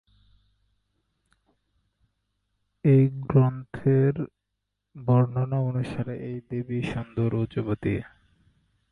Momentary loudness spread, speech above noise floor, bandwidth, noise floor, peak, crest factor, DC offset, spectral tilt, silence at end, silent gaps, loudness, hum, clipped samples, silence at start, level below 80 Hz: 12 LU; 57 dB; 4.6 kHz; -81 dBFS; -8 dBFS; 20 dB; under 0.1%; -10 dB/octave; 0.85 s; none; -26 LUFS; 50 Hz at -65 dBFS; under 0.1%; 2.85 s; -54 dBFS